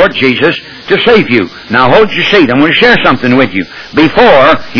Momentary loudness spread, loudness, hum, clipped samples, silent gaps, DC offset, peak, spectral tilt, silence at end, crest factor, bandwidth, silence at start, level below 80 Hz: 8 LU; -7 LUFS; none; 5%; none; under 0.1%; 0 dBFS; -6.5 dB/octave; 0 s; 8 dB; 5.4 kHz; 0 s; -36 dBFS